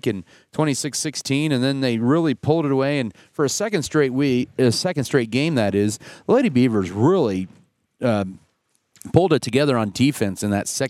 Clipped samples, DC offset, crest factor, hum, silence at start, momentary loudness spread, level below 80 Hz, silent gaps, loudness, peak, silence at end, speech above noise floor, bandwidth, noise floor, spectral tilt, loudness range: under 0.1%; under 0.1%; 20 dB; none; 0.05 s; 7 LU; -56 dBFS; none; -20 LUFS; 0 dBFS; 0 s; 48 dB; 15.5 kHz; -68 dBFS; -5.5 dB/octave; 2 LU